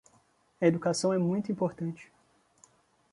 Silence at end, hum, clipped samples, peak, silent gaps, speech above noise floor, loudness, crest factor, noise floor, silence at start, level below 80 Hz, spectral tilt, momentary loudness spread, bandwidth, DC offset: 1.1 s; none; under 0.1%; -10 dBFS; none; 38 dB; -30 LUFS; 22 dB; -67 dBFS; 0.6 s; -72 dBFS; -6 dB/octave; 11 LU; 11.5 kHz; under 0.1%